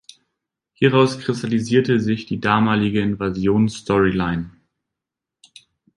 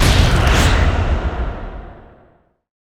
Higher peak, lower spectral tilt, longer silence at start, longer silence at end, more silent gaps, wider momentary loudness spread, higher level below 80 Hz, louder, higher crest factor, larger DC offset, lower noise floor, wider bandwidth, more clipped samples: about the same, -2 dBFS vs 0 dBFS; first, -6.5 dB/octave vs -5 dB/octave; first, 0.8 s vs 0 s; first, 1.45 s vs 0.85 s; neither; second, 6 LU vs 18 LU; second, -46 dBFS vs -20 dBFS; second, -19 LUFS vs -16 LUFS; about the same, 18 dB vs 16 dB; neither; first, -85 dBFS vs -54 dBFS; second, 11 kHz vs 16.5 kHz; neither